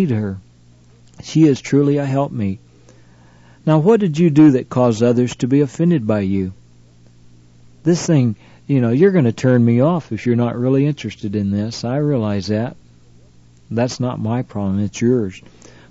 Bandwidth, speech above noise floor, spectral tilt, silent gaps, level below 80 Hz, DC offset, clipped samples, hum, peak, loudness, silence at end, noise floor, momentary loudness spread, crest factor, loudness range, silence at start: 8 kHz; 32 dB; -7.5 dB/octave; none; -54 dBFS; under 0.1%; under 0.1%; 60 Hz at -40 dBFS; -2 dBFS; -17 LUFS; 0.5 s; -48 dBFS; 10 LU; 14 dB; 6 LU; 0 s